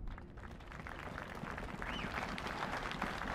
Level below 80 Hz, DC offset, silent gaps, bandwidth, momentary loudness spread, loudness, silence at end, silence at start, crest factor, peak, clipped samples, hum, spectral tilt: -52 dBFS; under 0.1%; none; 16 kHz; 10 LU; -43 LUFS; 0 s; 0 s; 20 dB; -24 dBFS; under 0.1%; none; -5 dB/octave